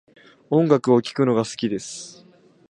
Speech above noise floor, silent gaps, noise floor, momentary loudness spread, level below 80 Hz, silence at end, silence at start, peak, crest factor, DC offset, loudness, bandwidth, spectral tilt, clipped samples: 33 dB; none; -53 dBFS; 17 LU; -66 dBFS; 0.6 s; 0.5 s; -2 dBFS; 20 dB; under 0.1%; -21 LUFS; 11 kHz; -6 dB/octave; under 0.1%